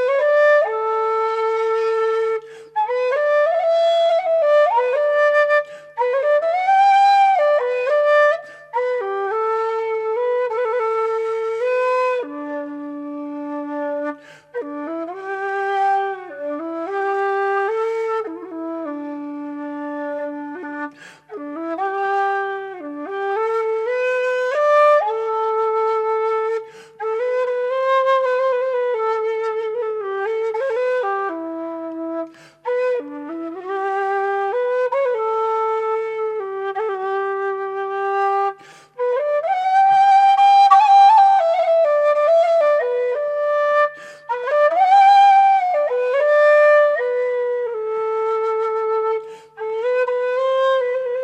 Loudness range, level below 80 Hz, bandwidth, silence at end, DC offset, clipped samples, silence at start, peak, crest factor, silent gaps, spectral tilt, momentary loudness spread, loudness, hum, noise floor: 10 LU; -78 dBFS; 8.6 kHz; 0 s; under 0.1%; under 0.1%; 0 s; -2 dBFS; 18 dB; none; -3 dB/octave; 15 LU; -18 LUFS; none; -38 dBFS